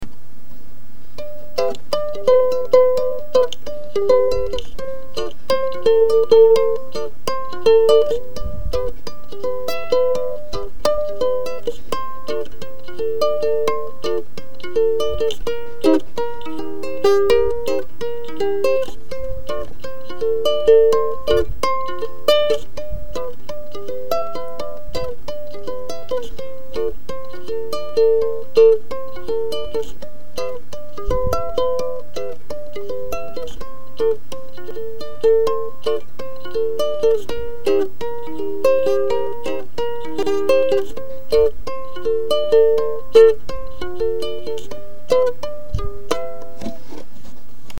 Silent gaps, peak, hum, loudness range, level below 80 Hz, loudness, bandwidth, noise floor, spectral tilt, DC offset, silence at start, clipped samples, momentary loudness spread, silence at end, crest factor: none; 0 dBFS; none; 9 LU; -38 dBFS; -20 LUFS; 17.5 kHz; -44 dBFS; -5 dB/octave; 10%; 0 s; under 0.1%; 18 LU; 0 s; 20 dB